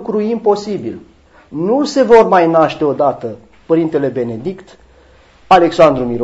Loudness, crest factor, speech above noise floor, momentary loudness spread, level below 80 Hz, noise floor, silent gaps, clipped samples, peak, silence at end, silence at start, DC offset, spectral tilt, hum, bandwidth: -13 LUFS; 14 dB; 33 dB; 18 LU; -46 dBFS; -46 dBFS; none; 0.4%; 0 dBFS; 0 s; 0 s; under 0.1%; -6.5 dB/octave; none; 8 kHz